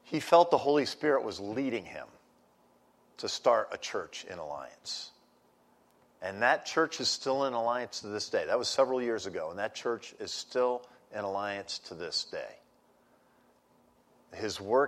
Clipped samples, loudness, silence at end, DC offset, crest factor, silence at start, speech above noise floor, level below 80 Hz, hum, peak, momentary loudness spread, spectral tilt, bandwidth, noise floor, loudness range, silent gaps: under 0.1%; -31 LUFS; 0 s; under 0.1%; 22 dB; 0.05 s; 35 dB; -76 dBFS; none; -10 dBFS; 14 LU; -3 dB/octave; 13 kHz; -66 dBFS; 7 LU; none